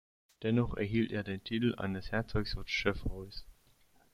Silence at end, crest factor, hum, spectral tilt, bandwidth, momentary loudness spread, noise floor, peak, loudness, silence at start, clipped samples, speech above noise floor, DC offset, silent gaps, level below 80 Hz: 0.6 s; 20 dB; none; -6.5 dB/octave; 14 kHz; 10 LU; -66 dBFS; -16 dBFS; -35 LUFS; 0.4 s; under 0.1%; 32 dB; under 0.1%; none; -48 dBFS